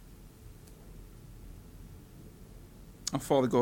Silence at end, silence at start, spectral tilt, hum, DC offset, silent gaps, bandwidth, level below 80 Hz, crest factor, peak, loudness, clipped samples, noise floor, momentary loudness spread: 0 s; 0.1 s; -5.5 dB/octave; none; under 0.1%; none; 17.5 kHz; -54 dBFS; 22 dB; -12 dBFS; -31 LUFS; under 0.1%; -51 dBFS; 24 LU